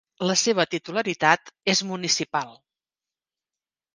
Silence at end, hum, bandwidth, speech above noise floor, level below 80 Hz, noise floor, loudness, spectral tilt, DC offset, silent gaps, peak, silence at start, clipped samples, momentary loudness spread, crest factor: 1.4 s; none; 10.5 kHz; over 66 dB; -70 dBFS; under -90 dBFS; -23 LUFS; -2.5 dB/octave; under 0.1%; none; -2 dBFS; 0.2 s; under 0.1%; 7 LU; 24 dB